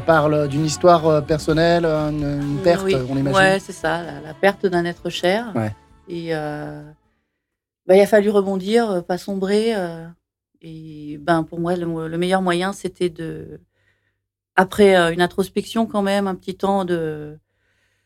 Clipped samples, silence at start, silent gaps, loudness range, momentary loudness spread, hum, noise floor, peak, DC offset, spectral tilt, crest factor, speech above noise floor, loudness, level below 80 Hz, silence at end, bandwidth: under 0.1%; 0 s; none; 6 LU; 16 LU; none; -80 dBFS; -4 dBFS; under 0.1%; -6 dB/octave; 16 dB; 61 dB; -19 LUFS; -48 dBFS; 0.7 s; 16 kHz